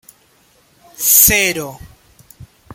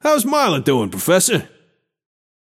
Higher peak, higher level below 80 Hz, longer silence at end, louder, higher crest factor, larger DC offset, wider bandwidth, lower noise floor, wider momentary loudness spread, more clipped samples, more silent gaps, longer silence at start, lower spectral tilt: about the same, 0 dBFS vs -2 dBFS; first, -40 dBFS vs -62 dBFS; second, 0 s vs 1.05 s; first, -10 LUFS vs -16 LUFS; about the same, 18 dB vs 16 dB; neither; first, over 20 kHz vs 16.5 kHz; second, -54 dBFS vs -60 dBFS; first, 18 LU vs 4 LU; neither; neither; first, 1 s vs 0.05 s; second, -1 dB/octave vs -3.5 dB/octave